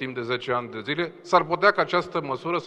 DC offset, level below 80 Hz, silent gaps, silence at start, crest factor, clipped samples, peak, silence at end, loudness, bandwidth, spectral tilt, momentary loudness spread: under 0.1%; -66 dBFS; none; 0 s; 20 dB; under 0.1%; -4 dBFS; 0 s; -24 LUFS; 9.4 kHz; -5.5 dB/octave; 9 LU